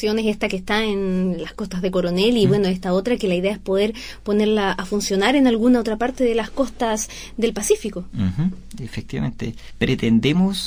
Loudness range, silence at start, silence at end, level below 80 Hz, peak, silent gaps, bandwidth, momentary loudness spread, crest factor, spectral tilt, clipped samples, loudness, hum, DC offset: 4 LU; 0 s; 0 s; -42 dBFS; -4 dBFS; none; 16 kHz; 11 LU; 16 dB; -5.5 dB/octave; under 0.1%; -20 LUFS; none; under 0.1%